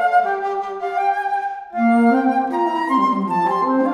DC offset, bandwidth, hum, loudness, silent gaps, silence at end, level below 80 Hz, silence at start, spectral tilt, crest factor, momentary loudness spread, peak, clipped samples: under 0.1%; 11 kHz; none; -19 LUFS; none; 0 s; -66 dBFS; 0 s; -7 dB/octave; 12 dB; 9 LU; -6 dBFS; under 0.1%